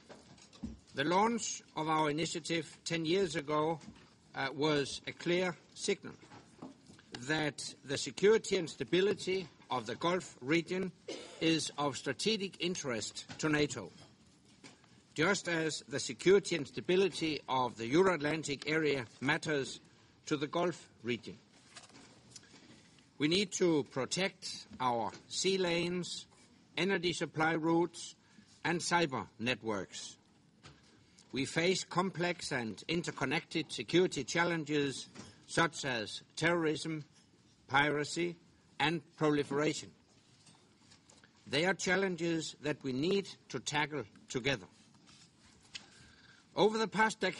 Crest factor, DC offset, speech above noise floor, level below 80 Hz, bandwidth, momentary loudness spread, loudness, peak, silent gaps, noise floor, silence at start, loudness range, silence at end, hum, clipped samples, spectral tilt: 22 dB; under 0.1%; 31 dB; -68 dBFS; 11.5 kHz; 14 LU; -34 LUFS; -14 dBFS; none; -66 dBFS; 0.1 s; 5 LU; 0 s; none; under 0.1%; -4 dB/octave